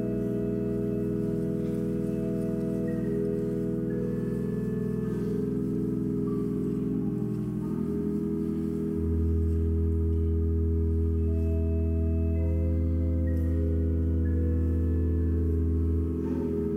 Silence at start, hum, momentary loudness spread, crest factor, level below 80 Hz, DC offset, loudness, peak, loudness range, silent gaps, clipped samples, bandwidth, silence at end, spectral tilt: 0 s; none; 3 LU; 10 dB; -34 dBFS; under 0.1%; -29 LUFS; -16 dBFS; 2 LU; none; under 0.1%; 3.1 kHz; 0 s; -11 dB/octave